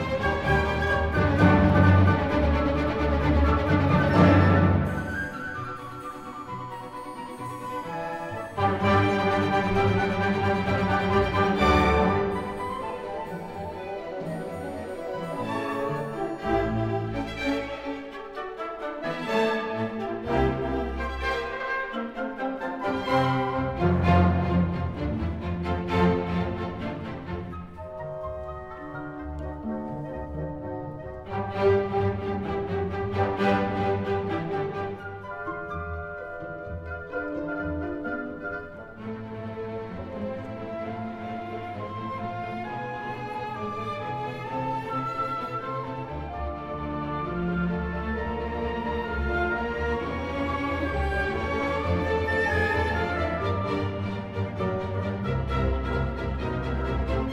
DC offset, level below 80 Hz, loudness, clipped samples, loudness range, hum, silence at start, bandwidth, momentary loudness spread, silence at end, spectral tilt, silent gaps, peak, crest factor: under 0.1%; -38 dBFS; -27 LUFS; under 0.1%; 11 LU; none; 0 s; 11.5 kHz; 14 LU; 0 s; -7.5 dB/octave; none; -6 dBFS; 20 dB